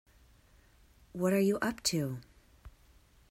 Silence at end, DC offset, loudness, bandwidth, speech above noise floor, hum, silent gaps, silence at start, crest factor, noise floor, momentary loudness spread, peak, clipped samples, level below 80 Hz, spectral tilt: 0.6 s; under 0.1%; -32 LUFS; 16 kHz; 32 dB; none; none; 1.15 s; 18 dB; -63 dBFS; 15 LU; -16 dBFS; under 0.1%; -62 dBFS; -4.5 dB/octave